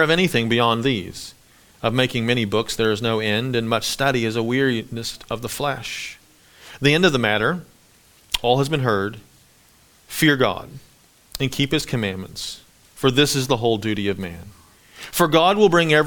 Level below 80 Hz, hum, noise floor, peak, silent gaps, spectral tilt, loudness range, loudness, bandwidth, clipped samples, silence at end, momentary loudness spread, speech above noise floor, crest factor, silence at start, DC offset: -48 dBFS; none; -54 dBFS; 0 dBFS; none; -4.5 dB/octave; 3 LU; -20 LUFS; 19.5 kHz; under 0.1%; 0 s; 15 LU; 34 dB; 20 dB; 0 s; under 0.1%